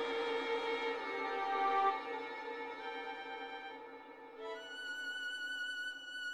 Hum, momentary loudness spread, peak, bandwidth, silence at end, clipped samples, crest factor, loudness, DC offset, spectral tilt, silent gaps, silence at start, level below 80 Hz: none; 14 LU; -22 dBFS; 14 kHz; 0 s; under 0.1%; 18 dB; -39 LUFS; under 0.1%; -1.5 dB/octave; none; 0 s; -82 dBFS